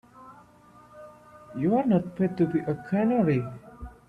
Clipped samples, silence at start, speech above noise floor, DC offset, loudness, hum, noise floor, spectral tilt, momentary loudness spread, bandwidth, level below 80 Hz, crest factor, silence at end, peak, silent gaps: under 0.1%; 0.2 s; 29 dB; under 0.1%; -26 LUFS; 60 Hz at -50 dBFS; -54 dBFS; -10 dB/octave; 17 LU; 5.2 kHz; -54 dBFS; 16 dB; 0.2 s; -12 dBFS; none